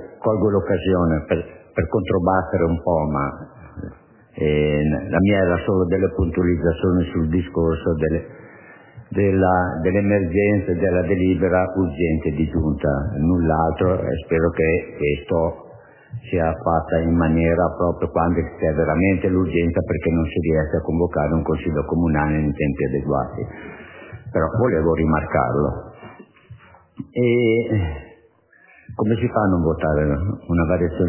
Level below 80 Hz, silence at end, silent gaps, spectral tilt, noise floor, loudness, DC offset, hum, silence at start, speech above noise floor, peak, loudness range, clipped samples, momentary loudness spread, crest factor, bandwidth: -32 dBFS; 0 s; none; -12 dB/octave; -54 dBFS; -20 LUFS; under 0.1%; none; 0 s; 35 dB; -4 dBFS; 3 LU; under 0.1%; 9 LU; 16 dB; 3.2 kHz